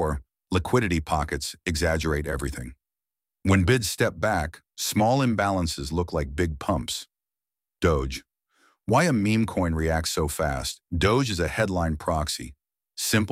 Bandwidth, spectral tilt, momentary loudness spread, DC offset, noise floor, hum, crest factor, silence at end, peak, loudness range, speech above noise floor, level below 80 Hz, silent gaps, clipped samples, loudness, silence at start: 16 kHz; -5 dB/octave; 11 LU; under 0.1%; under -90 dBFS; none; 18 dB; 0 s; -8 dBFS; 3 LU; over 66 dB; -38 dBFS; none; under 0.1%; -25 LUFS; 0 s